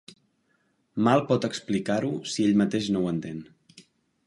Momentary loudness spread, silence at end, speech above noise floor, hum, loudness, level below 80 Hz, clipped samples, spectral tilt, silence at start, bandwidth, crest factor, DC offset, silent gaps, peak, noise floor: 11 LU; 0.45 s; 45 dB; none; -25 LUFS; -62 dBFS; under 0.1%; -6 dB/octave; 0.95 s; 11.5 kHz; 20 dB; under 0.1%; none; -6 dBFS; -70 dBFS